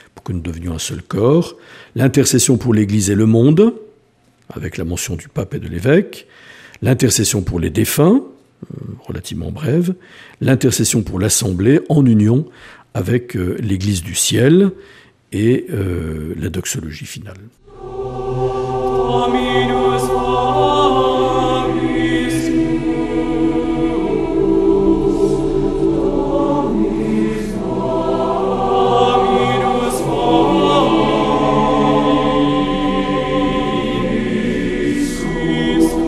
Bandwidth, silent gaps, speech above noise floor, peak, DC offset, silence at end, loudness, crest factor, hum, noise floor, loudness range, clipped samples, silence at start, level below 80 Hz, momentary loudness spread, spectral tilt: 15.5 kHz; none; 39 dB; 0 dBFS; under 0.1%; 0 s; -16 LUFS; 16 dB; none; -54 dBFS; 5 LU; under 0.1%; 0.15 s; -34 dBFS; 12 LU; -5.5 dB/octave